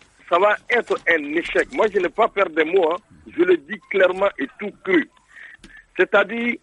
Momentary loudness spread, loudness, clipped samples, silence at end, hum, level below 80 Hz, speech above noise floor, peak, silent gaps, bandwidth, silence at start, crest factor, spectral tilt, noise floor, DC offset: 11 LU; -20 LUFS; under 0.1%; 0.05 s; none; -58 dBFS; 26 dB; -4 dBFS; none; 10 kHz; 0.3 s; 16 dB; -5 dB/octave; -45 dBFS; under 0.1%